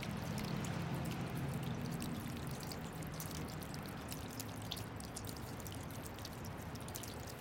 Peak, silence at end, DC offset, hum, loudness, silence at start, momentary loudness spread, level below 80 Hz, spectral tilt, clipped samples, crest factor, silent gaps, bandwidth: -22 dBFS; 0 s; under 0.1%; none; -44 LUFS; 0 s; 6 LU; -58 dBFS; -5 dB/octave; under 0.1%; 22 dB; none; 17 kHz